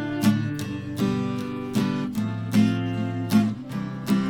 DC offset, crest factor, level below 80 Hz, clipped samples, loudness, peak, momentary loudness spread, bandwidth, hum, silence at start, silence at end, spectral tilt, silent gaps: under 0.1%; 16 dB; -54 dBFS; under 0.1%; -25 LUFS; -8 dBFS; 9 LU; 18 kHz; none; 0 s; 0 s; -6.5 dB/octave; none